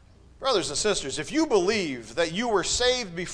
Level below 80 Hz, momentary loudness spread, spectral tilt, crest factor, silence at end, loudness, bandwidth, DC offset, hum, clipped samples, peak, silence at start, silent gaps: -48 dBFS; 6 LU; -2.5 dB/octave; 16 dB; 0 s; -25 LUFS; 10.5 kHz; under 0.1%; none; under 0.1%; -10 dBFS; 0.4 s; none